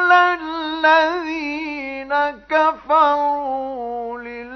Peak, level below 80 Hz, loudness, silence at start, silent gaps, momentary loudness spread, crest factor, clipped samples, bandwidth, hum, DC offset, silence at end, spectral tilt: -2 dBFS; -56 dBFS; -19 LUFS; 0 s; none; 13 LU; 16 dB; under 0.1%; 6.4 kHz; none; under 0.1%; 0 s; -3 dB/octave